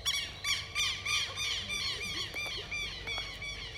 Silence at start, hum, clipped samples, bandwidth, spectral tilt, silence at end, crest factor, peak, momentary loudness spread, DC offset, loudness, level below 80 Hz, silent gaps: 0 s; none; under 0.1%; 16.5 kHz; -0.5 dB/octave; 0 s; 18 dB; -18 dBFS; 6 LU; under 0.1%; -33 LUFS; -52 dBFS; none